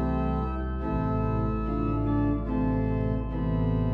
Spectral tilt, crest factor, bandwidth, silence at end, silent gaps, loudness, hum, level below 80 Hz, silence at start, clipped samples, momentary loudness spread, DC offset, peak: -11 dB/octave; 12 dB; 4.6 kHz; 0 s; none; -28 LUFS; none; -32 dBFS; 0 s; under 0.1%; 3 LU; under 0.1%; -16 dBFS